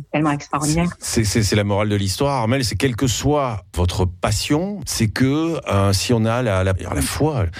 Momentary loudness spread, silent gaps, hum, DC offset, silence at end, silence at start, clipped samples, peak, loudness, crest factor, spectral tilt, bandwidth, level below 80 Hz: 4 LU; none; none; under 0.1%; 0 s; 0 s; under 0.1%; -6 dBFS; -19 LUFS; 14 dB; -5 dB/octave; 16 kHz; -36 dBFS